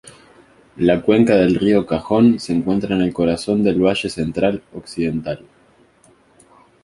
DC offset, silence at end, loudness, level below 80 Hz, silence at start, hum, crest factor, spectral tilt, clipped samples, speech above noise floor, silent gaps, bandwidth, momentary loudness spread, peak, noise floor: under 0.1%; 1.45 s; -17 LUFS; -46 dBFS; 0.05 s; none; 16 dB; -7 dB/octave; under 0.1%; 36 dB; none; 11.5 kHz; 10 LU; -2 dBFS; -53 dBFS